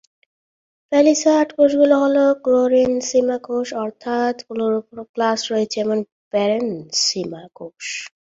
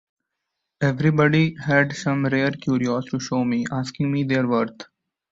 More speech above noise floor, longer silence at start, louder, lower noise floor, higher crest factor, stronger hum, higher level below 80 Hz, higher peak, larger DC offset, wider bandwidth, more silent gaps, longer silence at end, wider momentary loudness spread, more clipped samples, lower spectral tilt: first, over 72 dB vs 59 dB; about the same, 0.9 s vs 0.8 s; first, -18 LUFS vs -22 LUFS; first, under -90 dBFS vs -80 dBFS; about the same, 16 dB vs 18 dB; neither; about the same, -62 dBFS vs -58 dBFS; about the same, -2 dBFS vs -4 dBFS; neither; about the same, 8 kHz vs 8 kHz; first, 5.09-5.14 s, 6.12-6.31 s vs none; second, 0.3 s vs 0.45 s; first, 13 LU vs 7 LU; neither; second, -3.5 dB/octave vs -6.5 dB/octave